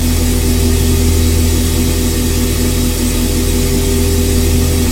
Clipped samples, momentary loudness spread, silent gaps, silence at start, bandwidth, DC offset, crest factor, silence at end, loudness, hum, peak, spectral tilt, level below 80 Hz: under 0.1%; 2 LU; none; 0 s; 16.5 kHz; under 0.1%; 12 dB; 0 s; -13 LUFS; none; 0 dBFS; -5 dB/octave; -16 dBFS